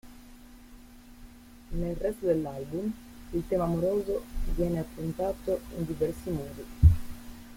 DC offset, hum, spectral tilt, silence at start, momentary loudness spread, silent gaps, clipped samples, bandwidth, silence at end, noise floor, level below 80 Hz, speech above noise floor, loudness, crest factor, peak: under 0.1%; none; -8.5 dB/octave; 0.05 s; 13 LU; none; under 0.1%; 16.5 kHz; 0 s; -50 dBFS; -38 dBFS; 20 dB; -30 LUFS; 22 dB; -8 dBFS